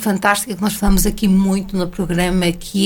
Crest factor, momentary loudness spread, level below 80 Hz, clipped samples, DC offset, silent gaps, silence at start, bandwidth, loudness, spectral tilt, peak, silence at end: 16 dB; 5 LU; -26 dBFS; under 0.1%; under 0.1%; none; 0 s; 19 kHz; -17 LUFS; -5 dB/octave; 0 dBFS; 0 s